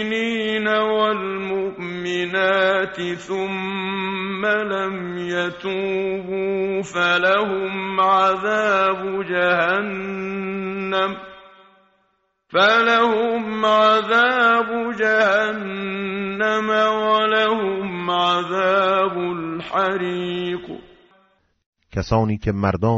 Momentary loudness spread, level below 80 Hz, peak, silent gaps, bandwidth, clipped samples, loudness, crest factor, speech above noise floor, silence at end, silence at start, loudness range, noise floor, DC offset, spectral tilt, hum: 10 LU; -50 dBFS; -4 dBFS; 21.66-21.73 s; 8 kHz; under 0.1%; -20 LUFS; 16 dB; 47 dB; 0 s; 0 s; 6 LU; -67 dBFS; under 0.1%; -2.5 dB/octave; none